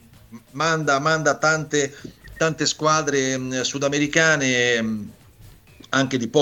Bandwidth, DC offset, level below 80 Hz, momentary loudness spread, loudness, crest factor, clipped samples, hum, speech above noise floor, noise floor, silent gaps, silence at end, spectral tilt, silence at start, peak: 18 kHz; under 0.1%; -54 dBFS; 10 LU; -20 LUFS; 18 dB; under 0.1%; none; 27 dB; -48 dBFS; none; 0 s; -3.5 dB/octave; 0.3 s; -4 dBFS